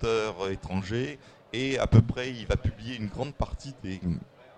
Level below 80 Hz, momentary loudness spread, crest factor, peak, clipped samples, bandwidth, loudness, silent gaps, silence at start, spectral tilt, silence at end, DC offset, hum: -40 dBFS; 15 LU; 24 dB; -4 dBFS; under 0.1%; 9 kHz; -30 LUFS; none; 0 s; -6.5 dB/octave; 0.3 s; under 0.1%; none